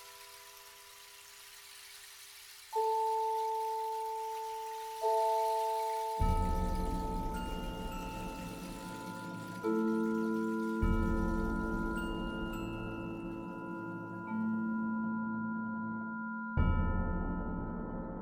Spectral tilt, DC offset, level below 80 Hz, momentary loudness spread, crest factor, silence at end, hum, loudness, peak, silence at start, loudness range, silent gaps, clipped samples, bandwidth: -6.5 dB/octave; under 0.1%; -42 dBFS; 17 LU; 18 dB; 0 s; none; -36 LUFS; -18 dBFS; 0 s; 4 LU; none; under 0.1%; 19 kHz